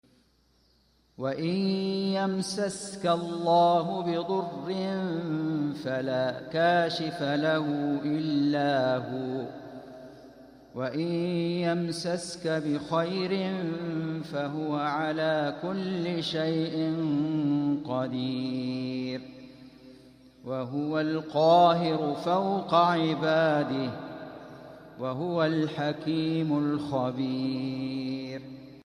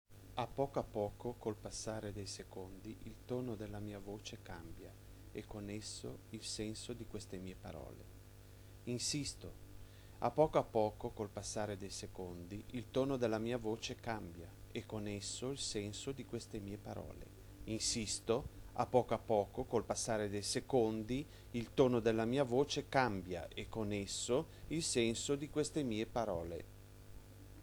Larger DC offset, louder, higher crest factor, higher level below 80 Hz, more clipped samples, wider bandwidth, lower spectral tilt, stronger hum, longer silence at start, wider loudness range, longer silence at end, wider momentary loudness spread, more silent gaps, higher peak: neither; first, -28 LUFS vs -40 LUFS; about the same, 20 dB vs 24 dB; second, -68 dBFS vs -60 dBFS; neither; second, 11.5 kHz vs over 20 kHz; first, -6 dB/octave vs -4.5 dB/octave; second, none vs 50 Hz at -60 dBFS; first, 1.2 s vs 0.1 s; second, 6 LU vs 11 LU; about the same, 0.05 s vs 0 s; second, 12 LU vs 18 LU; neither; first, -10 dBFS vs -16 dBFS